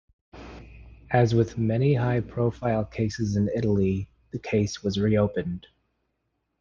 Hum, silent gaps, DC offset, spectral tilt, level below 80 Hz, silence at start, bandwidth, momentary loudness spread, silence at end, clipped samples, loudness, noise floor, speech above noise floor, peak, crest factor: none; none; under 0.1%; -7.5 dB/octave; -50 dBFS; 0.35 s; 7.4 kHz; 14 LU; 1 s; under 0.1%; -25 LUFS; -77 dBFS; 53 dB; -6 dBFS; 20 dB